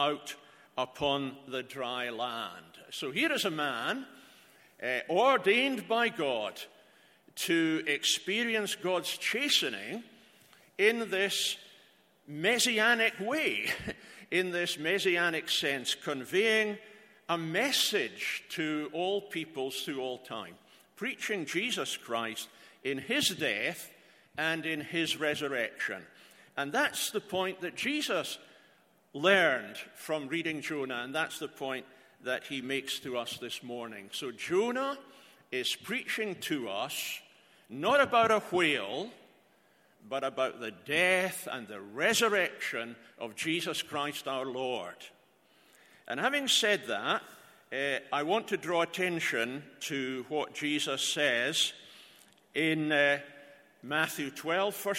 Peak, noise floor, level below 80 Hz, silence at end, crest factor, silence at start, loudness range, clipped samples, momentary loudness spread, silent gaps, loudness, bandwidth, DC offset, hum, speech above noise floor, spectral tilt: -10 dBFS; -66 dBFS; -74 dBFS; 0 s; 24 dB; 0 s; 6 LU; under 0.1%; 15 LU; none; -31 LUFS; 16.5 kHz; under 0.1%; none; 34 dB; -2.5 dB/octave